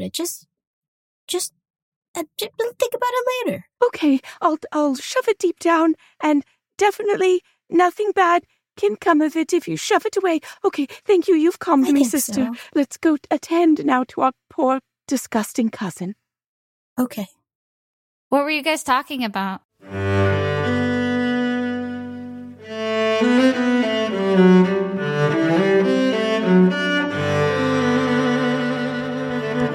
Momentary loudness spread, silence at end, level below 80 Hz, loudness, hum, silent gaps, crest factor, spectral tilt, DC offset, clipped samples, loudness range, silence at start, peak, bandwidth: 11 LU; 0 s; -64 dBFS; -20 LUFS; none; 0.67-0.82 s, 0.88-1.28 s, 1.70-1.74 s, 1.82-2.02 s, 2.08-2.14 s, 16.46-16.96 s, 17.55-18.31 s, 19.65-19.69 s; 16 dB; -5.5 dB/octave; under 0.1%; under 0.1%; 7 LU; 0 s; -4 dBFS; 16.5 kHz